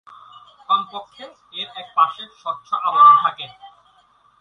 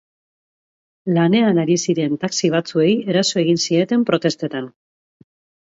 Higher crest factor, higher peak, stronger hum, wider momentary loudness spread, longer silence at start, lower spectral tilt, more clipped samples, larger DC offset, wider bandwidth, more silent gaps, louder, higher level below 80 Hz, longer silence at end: about the same, 18 dB vs 18 dB; about the same, -2 dBFS vs -2 dBFS; neither; first, 23 LU vs 10 LU; second, 0.7 s vs 1.05 s; second, -3.5 dB/octave vs -5 dB/octave; neither; neither; second, 6.2 kHz vs 8 kHz; neither; about the same, -17 LUFS vs -18 LUFS; second, -72 dBFS vs -66 dBFS; second, 0.75 s vs 1 s